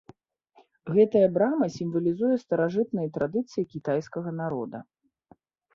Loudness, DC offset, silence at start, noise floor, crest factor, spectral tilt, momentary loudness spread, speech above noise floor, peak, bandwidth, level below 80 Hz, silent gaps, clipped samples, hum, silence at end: -26 LUFS; under 0.1%; 0.85 s; -62 dBFS; 18 dB; -8 dB/octave; 12 LU; 36 dB; -8 dBFS; 7.2 kHz; -68 dBFS; none; under 0.1%; none; 0.95 s